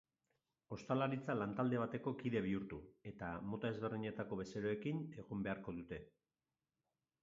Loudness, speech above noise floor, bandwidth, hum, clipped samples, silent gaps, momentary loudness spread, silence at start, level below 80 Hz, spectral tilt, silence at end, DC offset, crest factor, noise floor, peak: -43 LUFS; over 47 dB; 7.4 kHz; none; under 0.1%; none; 13 LU; 0.7 s; -70 dBFS; -6.5 dB/octave; 1.15 s; under 0.1%; 20 dB; under -90 dBFS; -24 dBFS